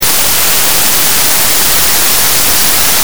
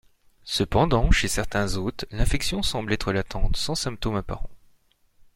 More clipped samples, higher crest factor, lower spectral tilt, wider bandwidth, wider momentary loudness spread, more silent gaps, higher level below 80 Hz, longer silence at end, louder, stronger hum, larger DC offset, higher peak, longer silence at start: first, 1% vs under 0.1%; second, 10 dB vs 20 dB; second, 0 dB/octave vs -4.5 dB/octave; first, over 20 kHz vs 16.5 kHz; second, 1 LU vs 10 LU; neither; about the same, -32 dBFS vs -30 dBFS; second, 0 s vs 0.8 s; first, -6 LUFS vs -25 LUFS; neither; first, 20% vs under 0.1%; first, 0 dBFS vs -4 dBFS; second, 0 s vs 0.45 s